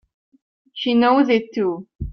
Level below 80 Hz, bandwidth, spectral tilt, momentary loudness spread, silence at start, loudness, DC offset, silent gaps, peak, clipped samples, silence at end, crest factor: -44 dBFS; 6.4 kHz; -7 dB/octave; 14 LU; 0.75 s; -18 LUFS; under 0.1%; 1.95-1.99 s; -4 dBFS; under 0.1%; 0 s; 16 dB